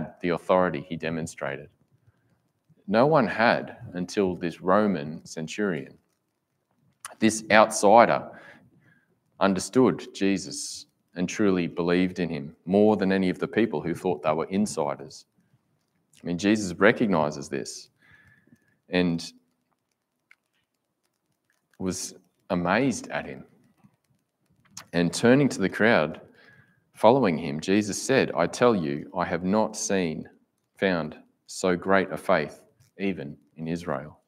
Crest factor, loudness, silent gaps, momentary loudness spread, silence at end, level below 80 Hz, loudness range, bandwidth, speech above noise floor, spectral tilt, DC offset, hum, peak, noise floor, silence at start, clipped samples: 24 dB; -25 LUFS; none; 16 LU; 0.15 s; -64 dBFS; 8 LU; 15.5 kHz; 54 dB; -5 dB/octave; under 0.1%; none; -2 dBFS; -78 dBFS; 0 s; under 0.1%